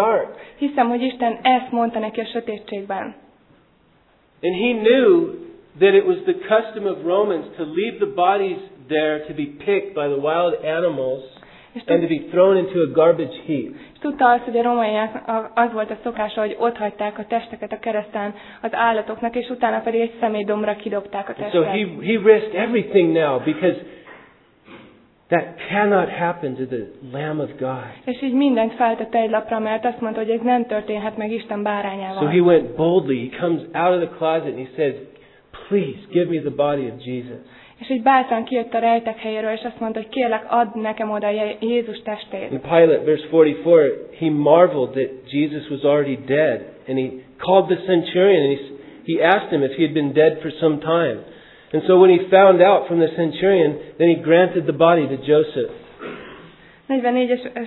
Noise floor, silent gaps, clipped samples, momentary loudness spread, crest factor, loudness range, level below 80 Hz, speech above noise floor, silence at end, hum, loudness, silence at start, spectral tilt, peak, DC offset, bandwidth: -57 dBFS; none; under 0.1%; 13 LU; 20 dB; 7 LU; -60 dBFS; 38 dB; 0 s; none; -19 LUFS; 0 s; -10 dB/octave; 0 dBFS; under 0.1%; 4.2 kHz